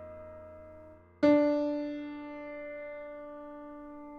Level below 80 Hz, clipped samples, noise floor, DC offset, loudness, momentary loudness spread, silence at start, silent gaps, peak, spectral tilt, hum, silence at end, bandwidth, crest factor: -66 dBFS; under 0.1%; -53 dBFS; under 0.1%; -31 LUFS; 24 LU; 0 s; none; -14 dBFS; -7 dB/octave; none; 0 s; 6.2 kHz; 20 dB